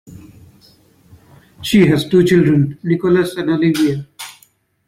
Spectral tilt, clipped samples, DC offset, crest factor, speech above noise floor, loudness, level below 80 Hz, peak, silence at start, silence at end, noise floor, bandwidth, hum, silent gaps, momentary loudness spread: -6.5 dB/octave; under 0.1%; under 0.1%; 14 dB; 41 dB; -14 LUFS; -48 dBFS; -2 dBFS; 0.1 s; 0.55 s; -54 dBFS; 16 kHz; none; none; 16 LU